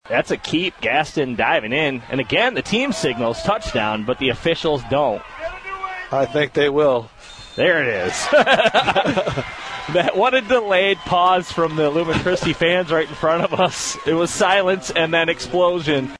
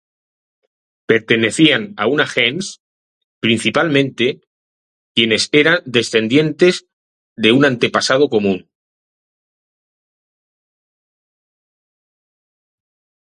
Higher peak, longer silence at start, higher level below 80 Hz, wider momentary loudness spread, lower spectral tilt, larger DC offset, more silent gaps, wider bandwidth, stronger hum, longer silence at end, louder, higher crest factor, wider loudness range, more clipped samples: about the same, -2 dBFS vs 0 dBFS; second, 0.05 s vs 1.1 s; first, -46 dBFS vs -60 dBFS; about the same, 8 LU vs 8 LU; about the same, -4 dB/octave vs -4.5 dB/octave; neither; second, none vs 2.80-3.41 s, 4.47-5.15 s, 6.93-7.36 s; about the same, 11 kHz vs 11.5 kHz; neither; second, 0 s vs 4.7 s; second, -18 LUFS vs -15 LUFS; about the same, 16 dB vs 18 dB; about the same, 3 LU vs 5 LU; neither